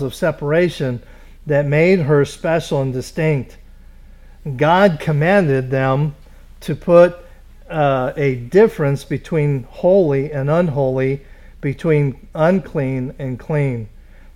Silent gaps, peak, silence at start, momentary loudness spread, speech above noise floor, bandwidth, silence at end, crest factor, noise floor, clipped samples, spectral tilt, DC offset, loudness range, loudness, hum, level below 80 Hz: none; 0 dBFS; 0 s; 13 LU; 24 dB; 13.5 kHz; 0.05 s; 16 dB; -40 dBFS; under 0.1%; -7.5 dB/octave; under 0.1%; 3 LU; -17 LUFS; none; -40 dBFS